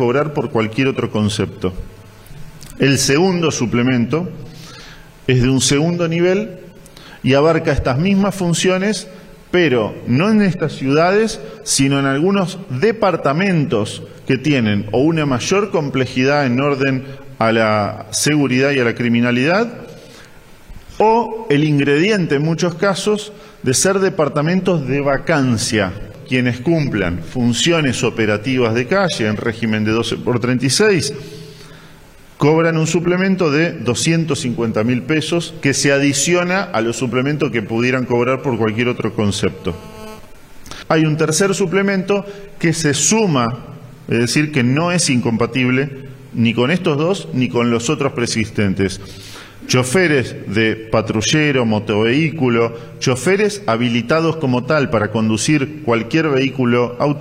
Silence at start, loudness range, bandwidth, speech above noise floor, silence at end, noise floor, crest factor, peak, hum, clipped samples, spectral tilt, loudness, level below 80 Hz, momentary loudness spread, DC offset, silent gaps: 0 s; 2 LU; 16 kHz; 26 dB; 0 s; -41 dBFS; 14 dB; -2 dBFS; none; under 0.1%; -5 dB/octave; -16 LUFS; -44 dBFS; 8 LU; under 0.1%; none